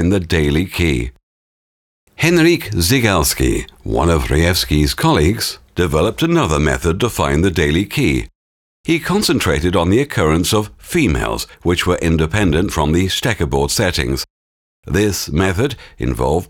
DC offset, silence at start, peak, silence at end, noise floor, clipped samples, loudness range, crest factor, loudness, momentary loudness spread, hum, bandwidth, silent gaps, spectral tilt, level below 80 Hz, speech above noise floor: under 0.1%; 0 s; 0 dBFS; 0.05 s; under -90 dBFS; under 0.1%; 2 LU; 16 dB; -16 LUFS; 7 LU; none; 19 kHz; 1.23-2.07 s, 8.35-8.84 s, 14.30-14.83 s; -5 dB/octave; -28 dBFS; over 75 dB